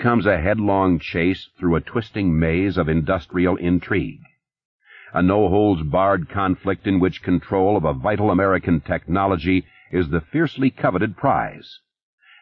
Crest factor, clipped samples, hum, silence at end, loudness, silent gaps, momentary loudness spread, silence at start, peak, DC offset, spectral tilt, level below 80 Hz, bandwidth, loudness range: 16 dB; under 0.1%; none; 0.7 s; -20 LUFS; 4.65-4.79 s; 5 LU; 0 s; -4 dBFS; under 0.1%; -10 dB/octave; -40 dBFS; 5.8 kHz; 2 LU